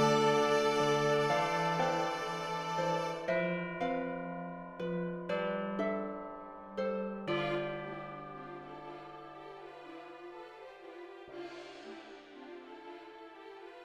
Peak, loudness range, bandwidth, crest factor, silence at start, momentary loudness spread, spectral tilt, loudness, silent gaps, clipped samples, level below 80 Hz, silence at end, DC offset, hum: -18 dBFS; 17 LU; 14 kHz; 18 dB; 0 s; 20 LU; -5 dB/octave; -34 LUFS; none; under 0.1%; -68 dBFS; 0 s; under 0.1%; none